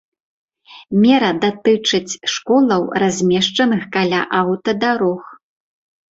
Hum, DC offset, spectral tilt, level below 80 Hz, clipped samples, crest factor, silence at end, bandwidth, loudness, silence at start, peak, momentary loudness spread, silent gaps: none; under 0.1%; -4.5 dB/octave; -58 dBFS; under 0.1%; 14 dB; 0.75 s; 8 kHz; -16 LUFS; 0.7 s; -2 dBFS; 6 LU; none